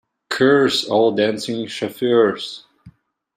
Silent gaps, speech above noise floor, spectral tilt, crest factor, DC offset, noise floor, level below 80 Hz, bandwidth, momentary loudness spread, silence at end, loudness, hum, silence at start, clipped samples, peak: none; 31 dB; -4.5 dB/octave; 16 dB; under 0.1%; -49 dBFS; -64 dBFS; 15.5 kHz; 13 LU; 0.45 s; -18 LUFS; none; 0.3 s; under 0.1%; -2 dBFS